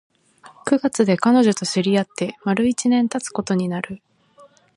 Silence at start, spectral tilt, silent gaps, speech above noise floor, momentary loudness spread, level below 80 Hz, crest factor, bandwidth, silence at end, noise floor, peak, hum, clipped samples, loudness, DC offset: 0.45 s; -5 dB/octave; none; 32 dB; 12 LU; -62 dBFS; 18 dB; 11.5 kHz; 0.8 s; -51 dBFS; -2 dBFS; none; under 0.1%; -20 LUFS; under 0.1%